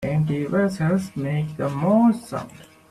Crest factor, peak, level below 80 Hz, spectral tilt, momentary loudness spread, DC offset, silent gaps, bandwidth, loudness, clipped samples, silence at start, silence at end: 14 dB; -8 dBFS; -54 dBFS; -8 dB/octave; 13 LU; under 0.1%; none; 13 kHz; -22 LUFS; under 0.1%; 0 s; 0.25 s